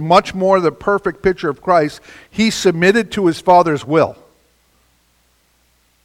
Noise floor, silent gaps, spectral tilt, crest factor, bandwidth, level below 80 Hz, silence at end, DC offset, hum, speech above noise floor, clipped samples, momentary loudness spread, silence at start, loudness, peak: -58 dBFS; none; -5.5 dB/octave; 16 dB; 15.5 kHz; -48 dBFS; 1.95 s; under 0.1%; none; 44 dB; under 0.1%; 8 LU; 0 s; -15 LUFS; 0 dBFS